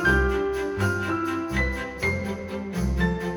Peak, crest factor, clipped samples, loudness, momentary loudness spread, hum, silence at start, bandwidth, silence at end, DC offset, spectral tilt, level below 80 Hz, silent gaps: -10 dBFS; 16 dB; under 0.1%; -26 LUFS; 6 LU; none; 0 s; over 20 kHz; 0 s; under 0.1%; -6 dB/octave; -32 dBFS; none